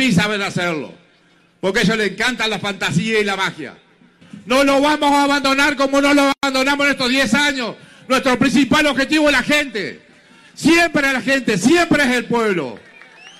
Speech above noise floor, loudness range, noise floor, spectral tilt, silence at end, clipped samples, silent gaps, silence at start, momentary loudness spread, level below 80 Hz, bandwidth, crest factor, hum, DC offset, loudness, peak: 38 dB; 4 LU; -54 dBFS; -4 dB/octave; 0.1 s; under 0.1%; none; 0 s; 9 LU; -46 dBFS; 15 kHz; 12 dB; none; under 0.1%; -16 LUFS; -4 dBFS